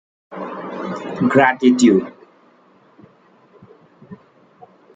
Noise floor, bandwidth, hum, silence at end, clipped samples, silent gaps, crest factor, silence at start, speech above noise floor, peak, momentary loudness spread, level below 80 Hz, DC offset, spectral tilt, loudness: -53 dBFS; 9.4 kHz; none; 0.8 s; under 0.1%; none; 20 dB; 0.3 s; 39 dB; -2 dBFS; 19 LU; -64 dBFS; under 0.1%; -5.5 dB/octave; -16 LUFS